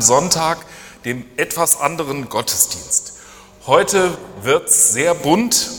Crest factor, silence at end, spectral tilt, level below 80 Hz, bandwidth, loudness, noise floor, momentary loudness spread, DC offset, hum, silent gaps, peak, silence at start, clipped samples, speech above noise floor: 18 dB; 0 s; -2 dB/octave; -50 dBFS; 19.5 kHz; -16 LUFS; -41 dBFS; 14 LU; under 0.1%; none; none; 0 dBFS; 0 s; under 0.1%; 24 dB